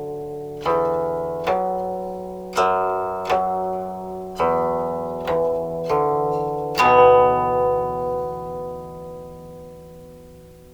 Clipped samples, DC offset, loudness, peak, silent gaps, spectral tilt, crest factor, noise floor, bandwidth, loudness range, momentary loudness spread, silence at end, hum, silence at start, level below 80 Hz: under 0.1%; under 0.1%; -21 LUFS; -4 dBFS; none; -6 dB/octave; 18 dB; -44 dBFS; over 20 kHz; 5 LU; 19 LU; 0 s; none; 0 s; -48 dBFS